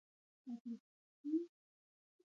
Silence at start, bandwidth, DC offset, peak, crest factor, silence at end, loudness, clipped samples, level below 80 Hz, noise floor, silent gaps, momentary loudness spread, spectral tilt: 0.45 s; 6.8 kHz; under 0.1%; -30 dBFS; 18 dB; 0.8 s; -47 LUFS; under 0.1%; under -90 dBFS; under -90 dBFS; 0.61-0.65 s, 0.80-1.24 s; 12 LU; -9 dB/octave